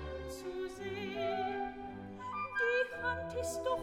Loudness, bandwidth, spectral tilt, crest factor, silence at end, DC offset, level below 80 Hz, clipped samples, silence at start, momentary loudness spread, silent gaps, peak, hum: -38 LUFS; 16 kHz; -4 dB/octave; 16 dB; 0 s; under 0.1%; -56 dBFS; under 0.1%; 0 s; 11 LU; none; -22 dBFS; none